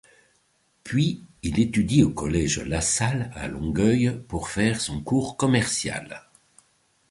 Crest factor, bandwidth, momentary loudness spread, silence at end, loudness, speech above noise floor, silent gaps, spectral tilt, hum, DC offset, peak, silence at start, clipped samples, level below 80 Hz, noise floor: 20 dB; 11.5 kHz; 10 LU; 0.9 s; -24 LUFS; 43 dB; none; -5 dB/octave; none; under 0.1%; -4 dBFS; 0.85 s; under 0.1%; -42 dBFS; -67 dBFS